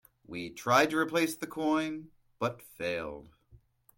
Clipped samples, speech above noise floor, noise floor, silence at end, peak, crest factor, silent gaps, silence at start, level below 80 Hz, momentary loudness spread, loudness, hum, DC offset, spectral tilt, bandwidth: under 0.1%; 31 dB; -62 dBFS; 0.7 s; -12 dBFS; 22 dB; none; 0.3 s; -66 dBFS; 17 LU; -31 LUFS; none; under 0.1%; -4.5 dB/octave; 17 kHz